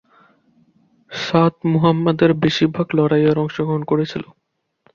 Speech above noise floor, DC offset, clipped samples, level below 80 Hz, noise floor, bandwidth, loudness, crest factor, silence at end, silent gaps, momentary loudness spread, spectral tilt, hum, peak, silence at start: 45 dB; under 0.1%; under 0.1%; -54 dBFS; -61 dBFS; 7.2 kHz; -18 LUFS; 16 dB; 0.7 s; none; 9 LU; -7.5 dB/octave; none; -2 dBFS; 1.1 s